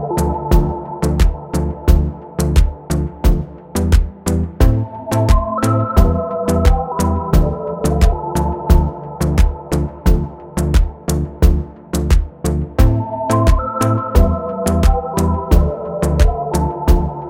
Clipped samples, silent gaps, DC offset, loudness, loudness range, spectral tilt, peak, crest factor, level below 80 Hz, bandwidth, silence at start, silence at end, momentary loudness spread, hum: under 0.1%; none; under 0.1%; -17 LUFS; 2 LU; -7 dB/octave; 0 dBFS; 14 dB; -16 dBFS; 16.5 kHz; 0 s; 0 s; 6 LU; none